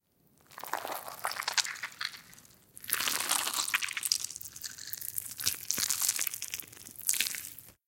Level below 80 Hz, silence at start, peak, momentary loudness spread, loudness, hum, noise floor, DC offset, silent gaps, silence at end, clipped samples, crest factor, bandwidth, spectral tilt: -72 dBFS; 0.5 s; -2 dBFS; 12 LU; -32 LUFS; none; -67 dBFS; under 0.1%; none; 0.15 s; under 0.1%; 34 dB; 17 kHz; 1.5 dB/octave